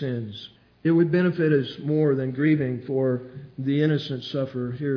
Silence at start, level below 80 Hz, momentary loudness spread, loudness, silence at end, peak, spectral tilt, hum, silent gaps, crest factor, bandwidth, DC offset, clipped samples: 0 s; -66 dBFS; 11 LU; -24 LUFS; 0 s; -8 dBFS; -9 dB/octave; none; none; 16 dB; 5.4 kHz; under 0.1%; under 0.1%